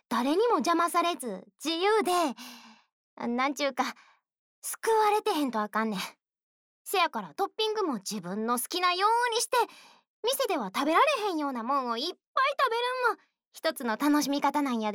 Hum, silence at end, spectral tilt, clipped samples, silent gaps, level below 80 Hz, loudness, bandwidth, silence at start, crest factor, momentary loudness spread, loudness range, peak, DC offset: none; 0 s; -3 dB/octave; under 0.1%; 2.92-3.17 s, 4.38-4.62 s, 6.43-6.85 s, 10.07-10.23 s, 12.27-12.35 s, 13.47-13.51 s; -82 dBFS; -28 LUFS; over 20 kHz; 0.1 s; 16 dB; 9 LU; 3 LU; -12 dBFS; under 0.1%